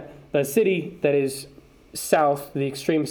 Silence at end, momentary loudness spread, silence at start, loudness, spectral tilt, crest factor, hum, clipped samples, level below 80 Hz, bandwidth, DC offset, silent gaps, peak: 0 s; 13 LU; 0 s; -23 LUFS; -5 dB/octave; 20 dB; none; under 0.1%; -60 dBFS; over 20 kHz; under 0.1%; none; -4 dBFS